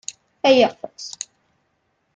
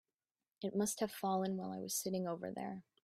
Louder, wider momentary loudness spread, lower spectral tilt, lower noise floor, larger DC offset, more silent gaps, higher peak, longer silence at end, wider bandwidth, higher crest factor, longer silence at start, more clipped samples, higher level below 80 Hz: first, -17 LUFS vs -40 LUFS; first, 19 LU vs 8 LU; second, -2.5 dB/octave vs -4.5 dB/octave; second, -69 dBFS vs under -90 dBFS; neither; neither; first, -4 dBFS vs -24 dBFS; first, 1.05 s vs 0.25 s; second, 9.4 kHz vs 16 kHz; about the same, 20 dB vs 16 dB; second, 0.45 s vs 0.6 s; neither; first, -68 dBFS vs -80 dBFS